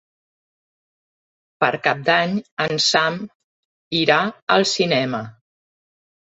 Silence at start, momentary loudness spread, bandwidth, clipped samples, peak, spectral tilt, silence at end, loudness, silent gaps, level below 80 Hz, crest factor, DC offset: 1.6 s; 10 LU; 8.2 kHz; under 0.1%; -2 dBFS; -3.5 dB/octave; 1 s; -19 LUFS; 2.51-2.57 s, 3.35-3.91 s, 4.42-4.47 s; -64 dBFS; 22 dB; under 0.1%